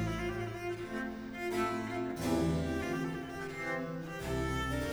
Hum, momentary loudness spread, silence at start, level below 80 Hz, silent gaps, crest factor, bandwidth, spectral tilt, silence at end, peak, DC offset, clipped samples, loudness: none; 7 LU; 0 s; -48 dBFS; none; 16 dB; over 20 kHz; -6 dB/octave; 0 s; -20 dBFS; under 0.1%; under 0.1%; -36 LUFS